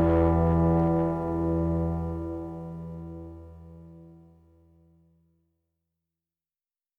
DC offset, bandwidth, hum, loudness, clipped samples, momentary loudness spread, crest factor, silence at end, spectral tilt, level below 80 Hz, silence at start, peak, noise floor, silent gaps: under 0.1%; 3.6 kHz; none; -26 LUFS; under 0.1%; 24 LU; 18 dB; 2.85 s; -11 dB/octave; -40 dBFS; 0 s; -12 dBFS; under -90 dBFS; none